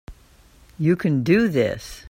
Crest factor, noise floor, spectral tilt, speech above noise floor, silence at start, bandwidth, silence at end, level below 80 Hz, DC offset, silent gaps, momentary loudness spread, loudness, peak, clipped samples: 18 dB; -52 dBFS; -7.5 dB/octave; 32 dB; 0.1 s; 16.5 kHz; 0.1 s; -48 dBFS; under 0.1%; none; 7 LU; -20 LUFS; -4 dBFS; under 0.1%